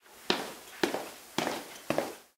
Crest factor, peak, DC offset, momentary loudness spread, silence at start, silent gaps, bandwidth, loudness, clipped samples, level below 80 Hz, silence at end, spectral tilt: 30 dB; -6 dBFS; under 0.1%; 7 LU; 0.05 s; none; 18 kHz; -34 LUFS; under 0.1%; -74 dBFS; 0.15 s; -3 dB/octave